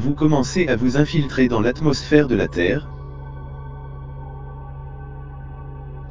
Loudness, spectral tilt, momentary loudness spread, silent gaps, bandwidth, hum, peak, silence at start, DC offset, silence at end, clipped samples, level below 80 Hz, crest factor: -19 LUFS; -6.5 dB/octave; 18 LU; none; 7.6 kHz; none; 0 dBFS; 0 s; under 0.1%; 0 s; under 0.1%; -36 dBFS; 20 dB